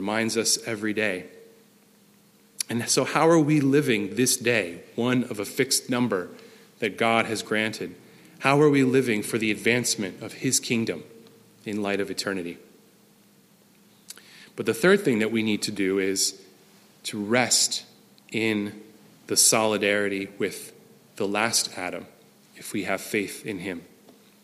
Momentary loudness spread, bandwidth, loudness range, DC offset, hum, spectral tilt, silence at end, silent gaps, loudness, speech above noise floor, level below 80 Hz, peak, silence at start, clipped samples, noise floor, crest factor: 15 LU; 15.5 kHz; 6 LU; under 0.1%; none; -3.5 dB/octave; 0.6 s; none; -24 LUFS; 33 dB; -72 dBFS; -4 dBFS; 0 s; under 0.1%; -58 dBFS; 22 dB